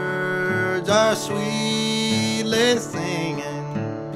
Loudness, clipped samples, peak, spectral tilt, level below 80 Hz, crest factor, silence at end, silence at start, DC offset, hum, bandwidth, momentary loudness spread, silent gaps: -22 LUFS; under 0.1%; -6 dBFS; -4 dB/octave; -58 dBFS; 16 dB; 0 s; 0 s; under 0.1%; none; 15.5 kHz; 10 LU; none